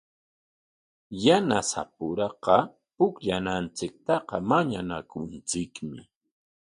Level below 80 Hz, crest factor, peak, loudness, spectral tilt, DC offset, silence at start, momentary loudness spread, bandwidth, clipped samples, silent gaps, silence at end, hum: -58 dBFS; 24 dB; -4 dBFS; -27 LUFS; -4.5 dB/octave; under 0.1%; 1.1 s; 15 LU; 11.5 kHz; under 0.1%; none; 0.65 s; none